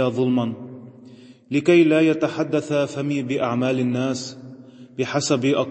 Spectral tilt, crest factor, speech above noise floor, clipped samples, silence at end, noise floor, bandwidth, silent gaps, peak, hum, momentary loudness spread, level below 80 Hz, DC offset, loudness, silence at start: -5.5 dB/octave; 18 dB; 25 dB; under 0.1%; 0 s; -45 dBFS; 8.6 kHz; none; -4 dBFS; none; 20 LU; -68 dBFS; under 0.1%; -21 LUFS; 0 s